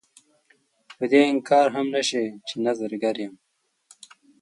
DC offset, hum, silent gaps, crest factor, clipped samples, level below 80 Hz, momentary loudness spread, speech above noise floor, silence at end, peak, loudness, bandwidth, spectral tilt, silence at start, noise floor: under 0.1%; none; none; 20 dB; under 0.1%; -78 dBFS; 12 LU; 42 dB; 1.1 s; -4 dBFS; -23 LUFS; 11.5 kHz; -4 dB/octave; 1 s; -64 dBFS